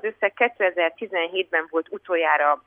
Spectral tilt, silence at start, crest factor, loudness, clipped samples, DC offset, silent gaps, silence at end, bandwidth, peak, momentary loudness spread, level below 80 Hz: -6 dB/octave; 0.05 s; 18 dB; -23 LUFS; under 0.1%; under 0.1%; none; 0.1 s; 3.7 kHz; -4 dBFS; 7 LU; -76 dBFS